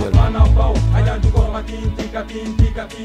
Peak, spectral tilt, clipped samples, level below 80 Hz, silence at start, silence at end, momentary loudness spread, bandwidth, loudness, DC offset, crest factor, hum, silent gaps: 0 dBFS; -7.5 dB/octave; under 0.1%; -18 dBFS; 0 s; 0 s; 11 LU; 9 kHz; -17 LUFS; under 0.1%; 14 dB; none; none